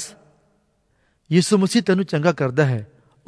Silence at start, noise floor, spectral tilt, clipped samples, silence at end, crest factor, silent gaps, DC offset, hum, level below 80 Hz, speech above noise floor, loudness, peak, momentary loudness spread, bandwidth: 0 s; -65 dBFS; -6 dB/octave; under 0.1%; 0.45 s; 18 dB; none; under 0.1%; none; -64 dBFS; 47 dB; -19 LUFS; -4 dBFS; 6 LU; 11 kHz